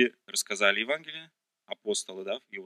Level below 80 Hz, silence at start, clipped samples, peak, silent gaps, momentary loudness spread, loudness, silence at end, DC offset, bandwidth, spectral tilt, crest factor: -88 dBFS; 0 s; under 0.1%; -6 dBFS; none; 17 LU; -29 LUFS; 0 s; under 0.1%; 15 kHz; -1 dB/octave; 24 dB